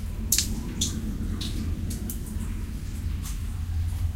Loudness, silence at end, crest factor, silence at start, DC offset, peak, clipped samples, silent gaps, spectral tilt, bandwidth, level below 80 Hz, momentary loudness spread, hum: -30 LUFS; 0 s; 26 dB; 0 s; 0.2%; -4 dBFS; under 0.1%; none; -3.5 dB/octave; 17 kHz; -32 dBFS; 10 LU; none